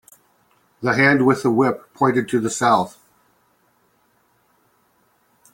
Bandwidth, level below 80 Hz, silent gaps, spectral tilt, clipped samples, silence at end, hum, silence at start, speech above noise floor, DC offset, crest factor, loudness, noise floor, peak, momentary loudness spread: 16.5 kHz; -62 dBFS; none; -5.5 dB/octave; under 0.1%; 2.65 s; none; 0.8 s; 44 dB; under 0.1%; 20 dB; -18 LUFS; -62 dBFS; -2 dBFS; 7 LU